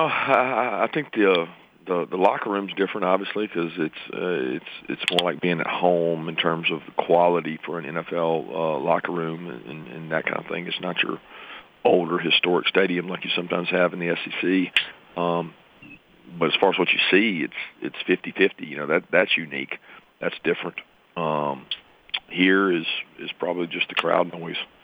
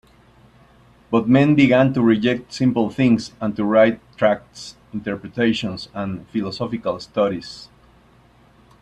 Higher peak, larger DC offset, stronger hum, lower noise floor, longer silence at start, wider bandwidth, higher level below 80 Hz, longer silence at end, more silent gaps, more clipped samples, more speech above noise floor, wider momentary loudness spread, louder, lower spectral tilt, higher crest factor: about the same, -4 dBFS vs -2 dBFS; neither; neither; second, -48 dBFS vs -52 dBFS; second, 0 s vs 1.1 s; about the same, 10.5 kHz vs 9.6 kHz; second, -70 dBFS vs -54 dBFS; second, 0.2 s vs 1.15 s; neither; neither; second, 25 dB vs 33 dB; about the same, 13 LU vs 14 LU; second, -23 LUFS vs -19 LUFS; about the same, -6 dB/octave vs -7 dB/octave; about the same, 20 dB vs 18 dB